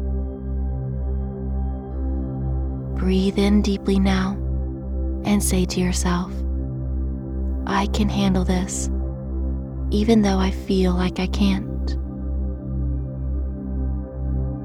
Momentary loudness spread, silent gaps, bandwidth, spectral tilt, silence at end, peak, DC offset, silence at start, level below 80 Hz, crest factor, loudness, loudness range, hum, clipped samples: 9 LU; none; 15 kHz; -6 dB/octave; 0 s; -4 dBFS; under 0.1%; 0 s; -26 dBFS; 18 dB; -23 LUFS; 4 LU; none; under 0.1%